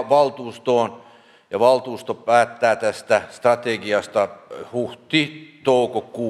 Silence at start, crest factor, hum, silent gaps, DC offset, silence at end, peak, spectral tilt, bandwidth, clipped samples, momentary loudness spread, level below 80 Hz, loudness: 0 s; 20 dB; none; none; under 0.1%; 0 s; -2 dBFS; -4.5 dB/octave; 12.5 kHz; under 0.1%; 10 LU; -72 dBFS; -21 LUFS